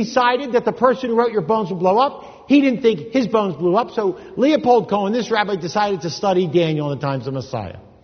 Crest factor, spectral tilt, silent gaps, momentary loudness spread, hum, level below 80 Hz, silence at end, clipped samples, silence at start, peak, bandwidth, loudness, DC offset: 18 dB; -6.5 dB/octave; none; 8 LU; none; -56 dBFS; 0.25 s; under 0.1%; 0 s; 0 dBFS; 6.6 kHz; -18 LUFS; under 0.1%